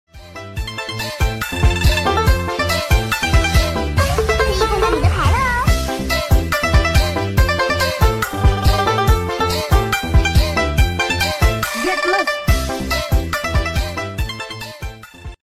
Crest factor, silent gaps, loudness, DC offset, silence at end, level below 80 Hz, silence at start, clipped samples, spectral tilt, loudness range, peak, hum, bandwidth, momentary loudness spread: 14 dB; none; -17 LUFS; under 0.1%; 0.1 s; -20 dBFS; 0.15 s; under 0.1%; -4.5 dB/octave; 2 LU; -4 dBFS; none; 16 kHz; 9 LU